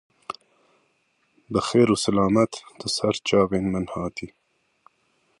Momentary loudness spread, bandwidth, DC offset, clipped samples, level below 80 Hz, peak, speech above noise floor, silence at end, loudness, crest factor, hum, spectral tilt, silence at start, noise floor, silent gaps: 19 LU; 11.5 kHz; under 0.1%; under 0.1%; -52 dBFS; -6 dBFS; 46 dB; 1.15 s; -23 LUFS; 20 dB; none; -5 dB/octave; 0.3 s; -68 dBFS; none